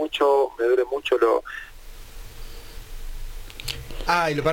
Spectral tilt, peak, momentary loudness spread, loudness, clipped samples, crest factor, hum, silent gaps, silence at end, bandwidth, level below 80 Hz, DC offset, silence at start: -4.5 dB/octave; -6 dBFS; 23 LU; -23 LUFS; under 0.1%; 18 dB; none; none; 0 s; 17 kHz; -38 dBFS; under 0.1%; 0 s